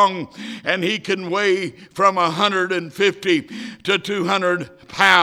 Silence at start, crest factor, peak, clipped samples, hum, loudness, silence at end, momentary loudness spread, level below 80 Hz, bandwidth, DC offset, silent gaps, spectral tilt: 0 s; 20 dB; 0 dBFS; under 0.1%; none; -19 LUFS; 0 s; 12 LU; -64 dBFS; 16 kHz; under 0.1%; none; -4 dB/octave